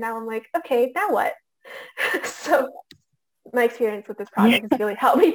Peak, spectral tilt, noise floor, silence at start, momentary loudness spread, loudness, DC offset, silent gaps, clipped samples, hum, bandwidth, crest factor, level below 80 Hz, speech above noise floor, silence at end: -4 dBFS; -4.5 dB/octave; -68 dBFS; 0 s; 14 LU; -22 LUFS; under 0.1%; none; under 0.1%; none; 19 kHz; 18 dB; -70 dBFS; 46 dB; 0 s